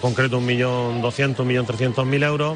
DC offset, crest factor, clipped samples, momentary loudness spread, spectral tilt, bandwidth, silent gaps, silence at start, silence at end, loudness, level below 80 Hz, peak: under 0.1%; 12 dB; under 0.1%; 3 LU; -6.5 dB/octave; 10 kHz; none; 0 s; 0 s; -21 LUFS; -54 dBFS; -8 dBFS